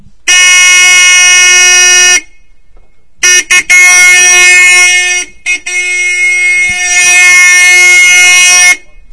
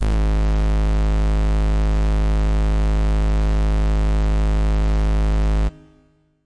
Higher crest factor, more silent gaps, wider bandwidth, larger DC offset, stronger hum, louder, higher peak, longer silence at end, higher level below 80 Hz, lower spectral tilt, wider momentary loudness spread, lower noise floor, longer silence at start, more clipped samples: about the same, 6 dB vs 4 dB; neither; first, 11 kHz vs 8.4 kHz; first, 3% vs 1%; second, none vs 50 Hz at -60 dBFS; first, -2 LUFS vs -21 LUFS; first, 0 dBFS vs -14 dBFS; first, 0.35 s vs 0 s; second, -42 dBFS vs -18 dBFS; second, 3.5 dB/octave vs -7.5 dB/octave; first, 8 LU vs 0 LU; second, -40 dBFS vs -57 dBFS; first, 0.25 s vs 0 s; first, 10% vs under 0.1%